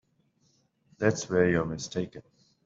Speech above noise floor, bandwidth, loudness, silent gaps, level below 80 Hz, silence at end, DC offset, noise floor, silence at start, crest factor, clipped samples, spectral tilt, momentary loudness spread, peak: 42 dB; 7.8 kHz; -28 LUFS; none; -58 dBFS; 0.45 s; under 0.1%; -70 dBFS; 1 s; 22 dB; under 0.1%; -5.5 dB/octave; 10 LU; -10 dBFS